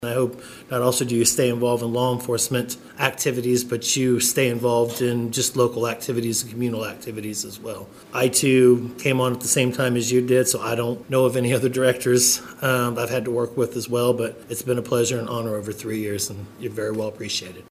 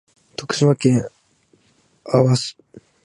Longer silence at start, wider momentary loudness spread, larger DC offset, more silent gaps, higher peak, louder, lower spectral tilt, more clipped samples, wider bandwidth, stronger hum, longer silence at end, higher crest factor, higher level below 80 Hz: second, 0 s vs 0.4 s; second, 11 LU vs 17 LU; neither; neither; about the same, -2 dBFS vs -2 dBFS; second, -22 LUFS vs -18 LUFS; second, -4 dB/octave vs -6 dB/octave; neither; first, 16 kHz vs 11.5 kHz; neither; second, 0.05 s vs 0.25 s; about the same, 20 dB vs 18 dB; about the same, -60 dBFS vs -58 dBFS